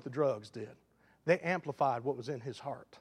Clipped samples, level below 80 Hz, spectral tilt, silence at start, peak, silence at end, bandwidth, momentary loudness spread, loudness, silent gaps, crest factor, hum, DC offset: under 0.1%; -80 dBFS; -6.5 dB/octave; 0 s; -16 dBFS; 0.05 s; 11.5 kHz; 14 LU; -35 LUFS; none; 20 dB; none; under 0.1%